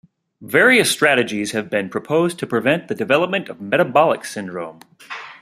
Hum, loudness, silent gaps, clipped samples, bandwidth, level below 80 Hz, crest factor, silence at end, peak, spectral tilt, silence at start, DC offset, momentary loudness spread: none; -17 LUFS; none; under 0.1%; 15.5 kHz; -64 dBFS; 18 dB; 0.05 s; -2 dBFS; -4 dB/octave; 0.4 s; under 0.1%; 17 LU